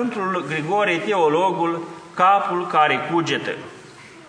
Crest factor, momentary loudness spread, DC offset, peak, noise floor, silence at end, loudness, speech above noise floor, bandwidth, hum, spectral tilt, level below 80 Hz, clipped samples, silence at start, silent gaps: 18 dB; 13 LU; under 0.1%; -4 dBFS; -43 dBFS; 0.05 s; -20 LUFS; 23 dB; 10 kHz; none; -5 dB/octave; -70 dBFS; under 0.1%; 0 s; none